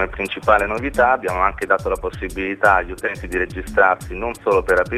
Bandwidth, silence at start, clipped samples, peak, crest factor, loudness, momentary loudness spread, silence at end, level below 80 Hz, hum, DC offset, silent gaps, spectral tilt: 15 kHz; 0 s; under 0.1%; 0 dBFS; 18 dB; -19 LUFS; 9 LU; 0 s; -36 dBFS; none; under 0.1%; none; -5.5 dB/octave